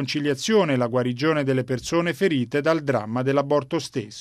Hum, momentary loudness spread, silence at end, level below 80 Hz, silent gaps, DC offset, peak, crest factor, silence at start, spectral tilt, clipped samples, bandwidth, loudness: none; 4 LU; 0 s; -60 dBFS; none; under 0.1%; -6 dBFS; 16 dB; 0 s; -5.5 dB/octave; under 0.1%; 13.5 kHz; -23 LUFS